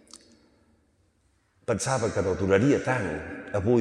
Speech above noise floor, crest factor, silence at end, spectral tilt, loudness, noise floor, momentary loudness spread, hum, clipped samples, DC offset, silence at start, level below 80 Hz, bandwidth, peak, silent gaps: 43 dB; 20 dB; 0 s; -6 dB/octave; -26 LUFS; -68 dBFS; 11 LU; none; under 0.1%; under 0.1%; 1.7 s; -58 dBFS; 12 kHz; -8 dBFS; none